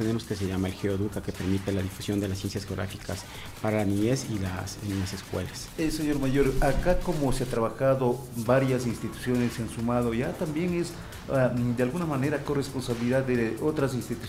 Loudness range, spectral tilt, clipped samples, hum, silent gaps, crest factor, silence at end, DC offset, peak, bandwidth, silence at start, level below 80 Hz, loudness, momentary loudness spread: 4 LU; -6 dB/octave; under 0.1%; none; none; 18 dB; 0 s; under 0.1%; -10 dBFS; 16 kHz; 0 s; -40 dBFS; -28 LUFS; 8 LU